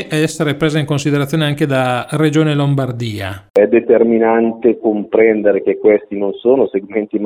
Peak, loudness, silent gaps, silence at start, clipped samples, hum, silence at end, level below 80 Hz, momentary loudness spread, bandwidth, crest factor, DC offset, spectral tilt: 0 dBFS; -14 LUFS; 3.50-3.54 s; 0 s; under 0.1%; none; 0 s; -52 dBFS; 7 LU; 15 kHz; 14 dB; under 0.1%; -6.5 dB/octave